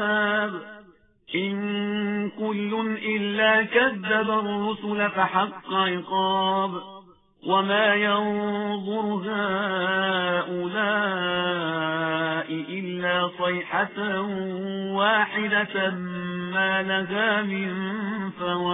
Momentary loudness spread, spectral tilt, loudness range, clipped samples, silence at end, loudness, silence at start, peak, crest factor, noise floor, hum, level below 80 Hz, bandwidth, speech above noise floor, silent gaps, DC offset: 9 LU; -9.5 dB/octave; 3 LU; under 0.1%; 0 s; -24 LUFS; 0 s; -6 dBFS; 18 dB; -54 dBFS; none; -64 dBFS; 4 kHz; 29 dB; none; under 0.1%